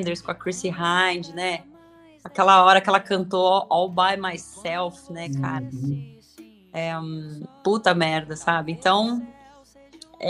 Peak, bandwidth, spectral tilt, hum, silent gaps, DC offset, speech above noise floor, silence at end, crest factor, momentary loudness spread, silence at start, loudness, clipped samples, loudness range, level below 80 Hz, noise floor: 0 dBFS; 12 kHz; -4.5 dB/octave; none; none; under 0.1%; 29 dB; 0 s; 22 dB; 16 LU; 0 s; -22 LUFS; under 0.1%; 9 LU; -62 dBFS; -51 dBFS